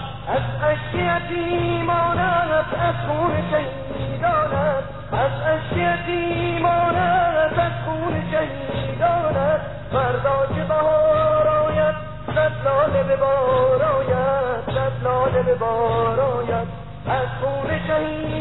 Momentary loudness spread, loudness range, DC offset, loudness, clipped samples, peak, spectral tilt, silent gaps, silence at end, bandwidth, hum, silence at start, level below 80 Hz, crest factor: 7 LU; 3 LU; 0.9%; -21 LUFS; under 0.1%; -8 dBFS; -10.5 dB/octave; none; 0 s; 4.1 kHz; 50 Hz at -35 dBFS; 0 s; -40 dBFS; 12 dB